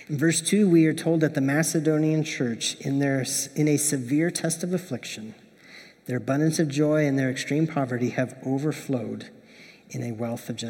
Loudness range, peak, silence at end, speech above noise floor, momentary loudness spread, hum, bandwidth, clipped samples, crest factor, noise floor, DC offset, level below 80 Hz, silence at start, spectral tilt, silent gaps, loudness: 4 LU; -8 dBFS; 0 s; 26 dB; 12 LU; none; 17.5 kHz; under 0.1%; 16 dB; -50 dBFS; under 0.1%; -74 dBFS; 0 s; -5 dB/octave; none; -25 LUFS